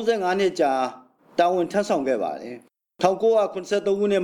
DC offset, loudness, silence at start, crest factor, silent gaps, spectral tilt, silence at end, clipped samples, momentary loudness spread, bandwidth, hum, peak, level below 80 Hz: under 0.1%; -23 LUFS; 0 s; 16 dB; none; -5 dB/octave; 0 s; under 0.1%; 10 LU; 13 kHz; none; -6 dBFS; -68 dBFS